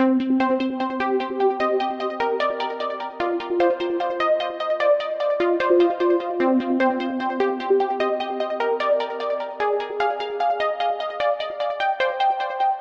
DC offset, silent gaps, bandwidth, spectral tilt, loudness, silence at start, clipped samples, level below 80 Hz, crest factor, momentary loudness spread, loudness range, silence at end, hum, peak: under 0.1%; none; 7.2 kHz; -5 dB/octave; -22 LUFS; 0 s; under 0.1%; -64 dBFS; 14 dB; 6 LU; 3 LU; 0 s; none; -8 dBFS